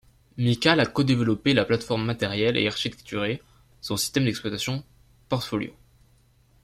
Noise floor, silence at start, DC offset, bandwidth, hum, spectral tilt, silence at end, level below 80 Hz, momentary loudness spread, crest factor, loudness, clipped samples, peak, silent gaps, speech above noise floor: -60 dBFS; 0.35 s; under 0.1%; 15.5 kHz; none; -5 dB/octave; 0.95 s; -56 dBFS; 10 LU; 22 dB; -25 LUFS; under 0.1%; -4 dBFS; none; 36 dB